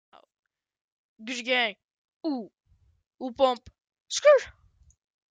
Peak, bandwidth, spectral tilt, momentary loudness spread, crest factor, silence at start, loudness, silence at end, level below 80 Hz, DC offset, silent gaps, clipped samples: -8 dBFS; 9.4 kHz; -2 dB/octave; 20 LU; 22 dB; 1.2 s; -26 LUFS; 0.8 s; -66 dBFS; under 0.1%; 1.84-2.21 s, 4.00-4.06 s; under 0.1%